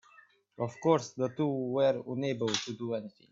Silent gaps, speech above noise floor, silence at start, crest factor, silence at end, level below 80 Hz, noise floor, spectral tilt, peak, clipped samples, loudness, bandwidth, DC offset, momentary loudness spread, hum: none; 30 dB; 0.6 s; 20 dB; 0.2 s; -74 dBFS; -62 dBFS; -5.5 dB/octave; -12 dBFS; under 0.1%; -32 LUFS; 7.8 kHz; under 0.1%; 9 LU; none